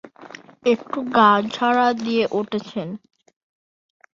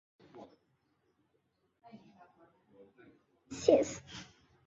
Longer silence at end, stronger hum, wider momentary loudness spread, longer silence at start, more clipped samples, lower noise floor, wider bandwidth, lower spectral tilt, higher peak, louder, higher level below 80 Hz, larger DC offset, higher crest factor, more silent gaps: first, 1.2 s vs 0.45 s; neither; second, 23 LU vs 28 LU; second, 0.05 s vs 0.35 s; neither; second, -43 dBFS vs -78 dBFS; about the same, 7.6 kHz vs 7.6 kHz; about the same, -5.5 dB/octave vs -4.5 dB/octave; first, -2 dBFS vs -12 dBFS; first, -20 LUFS vs -31 LUFS; about the same, -66 dBFS vs -70 dBFS; neither; second, 20 dB vs 28 dB; neither